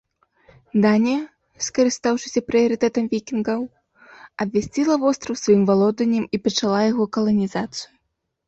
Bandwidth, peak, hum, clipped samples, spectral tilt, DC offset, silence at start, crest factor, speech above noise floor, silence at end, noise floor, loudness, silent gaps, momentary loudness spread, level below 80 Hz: 8.2 kHz; -6 dBFS; none; under 0.1%; -5 dB/octave; under 0.1%; 0.75 s; 16 dB; 55 dB; 0.6 s; -75 dBFS; -21 LUFS; none; 11 LU; -58 dBFS